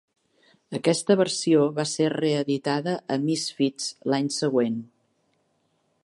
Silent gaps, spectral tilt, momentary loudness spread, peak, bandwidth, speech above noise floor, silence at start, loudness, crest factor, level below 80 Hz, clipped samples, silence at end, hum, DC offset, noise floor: none; -5 dB/octave; 6 LU; -6 dBFS; 11.5 kHz; 46 dB; 0.7 s; -24 LUFS; 18 dB; -76 dBFS; under 0.1%; 1.2 s; none; under 0.1%; -70 dBFS